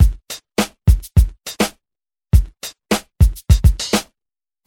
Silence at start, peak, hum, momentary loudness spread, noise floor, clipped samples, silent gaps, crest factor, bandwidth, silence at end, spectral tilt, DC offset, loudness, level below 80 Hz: 0 s; 0 dBFS; none; 9 LU; under -90 dBFS; under 0.1%; none; 16 dB; 17.5 kHz; 0.65 s; -5.5 dB/octave; under 0.1%; -18 LUFS; -20 dBFS